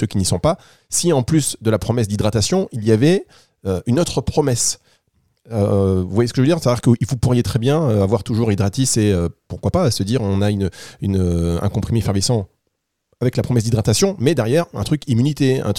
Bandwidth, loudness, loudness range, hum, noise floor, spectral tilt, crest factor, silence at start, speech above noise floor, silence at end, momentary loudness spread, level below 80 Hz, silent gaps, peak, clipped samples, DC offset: 16 kHz; -18 LUFS; 3 LU; none; -73 dBFS; -5.5 dB/octave; 16 dB; 0 s; 56 dB; 0 s; 6 LU; -42 dBFS; none; -2 dBFS; under 0.1%; 0.5%